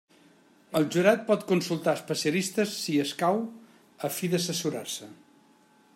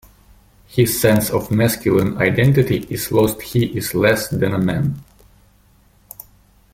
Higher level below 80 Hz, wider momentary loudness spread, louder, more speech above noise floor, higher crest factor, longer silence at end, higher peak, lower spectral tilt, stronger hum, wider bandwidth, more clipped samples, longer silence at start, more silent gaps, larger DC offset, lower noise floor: second, -74 dBFS vs -44 dBFS; about the same, 11 LU vs 9 LU; second, -28 LUFS vs -17 LUFS; second, 33 dB vs 37 dB; about the same, 20 dB vs 16 dB; second, 0.8 s vs 1.7 s; second, -10 dBFS vs -2 dBFS; about the same, -4.5 dB/octave vs -5.5 dB/octave; neither; about the same, 16 kHz vs 16.5 kHz; neither; about the same, 0.7 s vs 0.7 s; neither; neither; first, -61 dBFS vs -53 dBFS